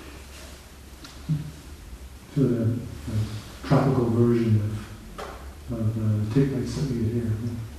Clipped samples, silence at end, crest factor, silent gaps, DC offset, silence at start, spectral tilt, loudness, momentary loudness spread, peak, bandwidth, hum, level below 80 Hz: under 0.1%; 0 s; 18 dB; none; under 0.1%; 0 s; -8 dB/octave; -26 LUFS; 22 LU; -8 dBFS; 13.5 kHz; none; -44 dBFS